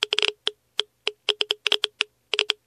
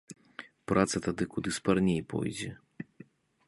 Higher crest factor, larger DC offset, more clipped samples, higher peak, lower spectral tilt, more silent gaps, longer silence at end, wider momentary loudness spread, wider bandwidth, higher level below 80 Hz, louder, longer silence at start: about the same, 26 dB vs 24 dB; neither; neither; first, -2 dBFS vs -10 dBFS; second, 2 dB/octave vs -5.5 dB/octave; neither; second, 0.15 s vs 0.65 s; second, 8 LU vs 20 LU; first, 14 kHz vs 11.5 kHz; second, -80 dBFS vs -56 dBFS; first, -24 LUFS vs -31 LUFS; about the same, 0 s vs 0.1 s